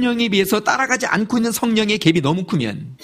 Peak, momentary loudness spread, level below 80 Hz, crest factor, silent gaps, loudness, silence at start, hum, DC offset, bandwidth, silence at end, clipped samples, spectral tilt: 0 dBFS; 5 LU; -54 dBFS; 18 dB; none; -18 LUFS; 0 s; none; under 0.1%; 15.5 kHz; 0.1 s; under 0.1%; -4.5 dB/octave